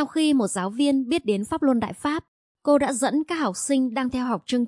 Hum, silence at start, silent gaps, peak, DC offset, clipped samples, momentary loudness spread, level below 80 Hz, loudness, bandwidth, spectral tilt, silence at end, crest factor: none; 0 s; 2.28-2.55 s; -8 dBFS; under 0.1%; under 0.1%; 6 LU; -58 dBFS; -23 LUFS; 11.5 kHz; -4.5 dB/octave; 0 s; 16 dB